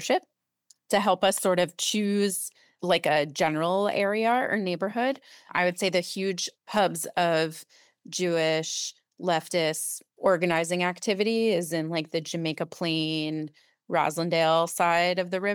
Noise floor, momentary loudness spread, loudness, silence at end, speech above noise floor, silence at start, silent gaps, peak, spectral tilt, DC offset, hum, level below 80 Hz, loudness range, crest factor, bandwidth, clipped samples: -64 dBFS; 8 LU; -26 LUFS; 0 s; 38 dB; 0 s; none; -10 dBFS; -3.5 dB/octave; under 0.1%; none; -72 dBFS; 3 LU; 16 dB; 19.5 kHz; under 0.1%